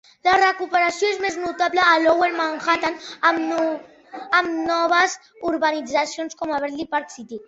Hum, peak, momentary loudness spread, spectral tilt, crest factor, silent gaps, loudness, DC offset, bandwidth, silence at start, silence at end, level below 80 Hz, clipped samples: none; -4 dBFS; 10 LU; -2 dB/octave; 18 dB; none; -20 LUFS; under 0.1%; 8.2 kHz; 0.25 s; 0.05 s; -62 dBFS; under 0.1%